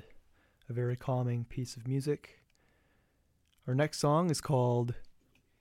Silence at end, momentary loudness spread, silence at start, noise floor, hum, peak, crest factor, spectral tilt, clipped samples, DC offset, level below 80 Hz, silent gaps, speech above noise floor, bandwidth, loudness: 0.5 s; 11 LU; 0.1 s; -73 dBFS; none; -16 dBFS; 18 dB; -6.5 dB/octave; under 0.1%; under 0.1%; -60 dBFS; none; 41 dB; 15 kHz; -33 LUFS